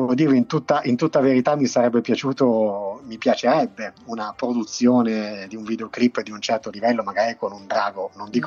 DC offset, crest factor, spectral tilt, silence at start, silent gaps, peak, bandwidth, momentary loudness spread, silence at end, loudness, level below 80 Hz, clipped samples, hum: under 0.1%; 16 dB; -5.5 dB/octave; 0 s; none; -6 dBFS; 7.2 kHz; 12 LU; 0 s; -21 LUFS; -66 dBFS; under 0.1%; none